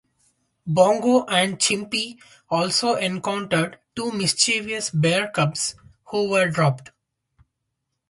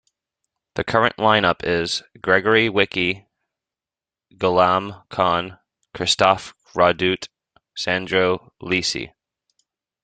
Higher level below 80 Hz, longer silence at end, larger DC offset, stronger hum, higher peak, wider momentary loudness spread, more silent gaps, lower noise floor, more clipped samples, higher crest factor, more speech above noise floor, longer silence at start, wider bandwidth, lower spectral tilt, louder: second, -62 dBFS vs -56 dBFS; first, 1.25 s vs 0.95 s; neither; neither; about the same, -4 dBFS vs -2 dBFS; second, 10 LU vs 13 LU; neither; second, -78 dBFS vs under -90 dBFS; neither; about the same, 20 dB vs 20 dB; second, 57 dB vs over 70 dB; about the same, 0.65 s vs 0.75 s; first, 11.5 kHz vs 9.4 kHz; about the same, -3.5 dB/octave vs -4 dB/octave; about the same, -21 LUFS vs -20 LUFS